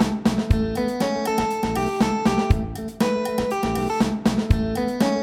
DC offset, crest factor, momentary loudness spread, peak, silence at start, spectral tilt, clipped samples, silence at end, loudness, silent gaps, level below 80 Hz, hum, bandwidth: under 0.1%; 18 dB; 3 LU; -4 dBFS; 0 s; -6 dB/octave; under 0.1%; 0 s; -23 LUFS; none; -32 dBFS; none; 16.5 kHz